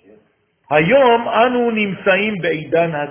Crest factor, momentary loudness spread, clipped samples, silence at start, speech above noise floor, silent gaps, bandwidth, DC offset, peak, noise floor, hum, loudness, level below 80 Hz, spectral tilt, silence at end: 16 dB; 6 LU; under 0.1%; 0.7 s; 44 dB; none; 3.6 kHz; under 0.1%; 0 dBFS; -59 dBFS; none; -15 LUFS; -54 dBFS; -9.5 dB/octave; 0 s